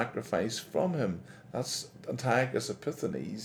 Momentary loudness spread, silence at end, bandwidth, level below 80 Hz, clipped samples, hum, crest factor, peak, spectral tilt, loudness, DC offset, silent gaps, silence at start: 9 LU; 0 s; 18.5 kHz; -68 dBFS; under 0.1%; none; 20 dB; -12 dBFS; -5 dB/octave; -33 LUFS; under 0.1%; none; 0 s